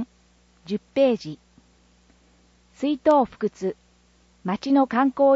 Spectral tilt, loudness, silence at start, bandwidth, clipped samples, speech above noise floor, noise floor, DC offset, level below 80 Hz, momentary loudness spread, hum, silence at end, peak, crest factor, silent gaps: -7 dB/octave; -23 LUFS; 0 s; 7.8 kHz; under 0.1%; 38 dB; -59 dBFS; under 0.1%; -60 dBFS; 18 LU; 60 Hz at -55 dBFS; 0 s; -8 dBFS; 16 dB; none